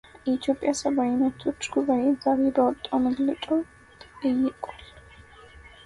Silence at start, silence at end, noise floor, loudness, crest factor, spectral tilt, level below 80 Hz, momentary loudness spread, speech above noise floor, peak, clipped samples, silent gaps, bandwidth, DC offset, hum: 0.25 s; 0.15 s; -49 dBFS; -25 LUFS; 16 dB; -4.5 dB/octave; -56 dBFS; 8 LU; 25 dB; -10 dBFS; under 0.1%; none; 11.5 kHz; under 0.1%; none